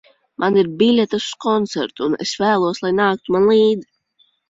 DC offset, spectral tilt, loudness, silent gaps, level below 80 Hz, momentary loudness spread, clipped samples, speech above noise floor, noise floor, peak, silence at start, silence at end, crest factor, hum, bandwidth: under 0.1%; -5 dB/octave; -17 LUFS; none; -58 dBFS; 7 LU; under 0.1%; 44 dB; -61 dBFS; -2 dBFS; 0.4 s; 0.65 s; 14 dB; none; 7.8 kHz